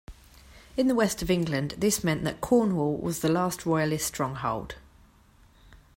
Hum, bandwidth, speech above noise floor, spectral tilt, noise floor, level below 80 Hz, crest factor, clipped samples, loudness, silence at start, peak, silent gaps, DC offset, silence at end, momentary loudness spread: none; 16.5 kHz; 31 dB; -5 dB/octave; -58 dBFS; -50 dBFS; 18 dB; under 0.1%; -27 LUFS; 0.1 s; -10 dBFS; none; under 0.1%; 0.2 s; 7 LU